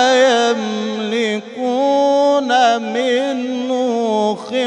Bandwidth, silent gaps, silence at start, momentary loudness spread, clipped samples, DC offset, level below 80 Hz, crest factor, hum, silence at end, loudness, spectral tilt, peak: 10.5 kHz; none; 0 s; 7 LU; under 0.1%; under 0.1%; -74 dBFS; 12 dB; none; 0 s; -16 LUFS; -3.5 dB/octave; -2 dBFS